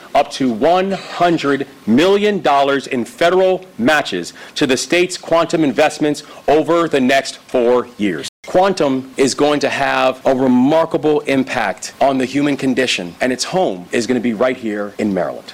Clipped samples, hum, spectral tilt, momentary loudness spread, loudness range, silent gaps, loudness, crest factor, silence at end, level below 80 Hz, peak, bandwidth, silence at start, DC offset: under 0.1%; none; -4.5 dB/octave; 7 LU; 2 LU; 8.29-8.43 s; -16 LUFS; 10 dB; 0 s; -50 dBFS; -4 dBFS; 16 kHz; 0 s; under 0.1%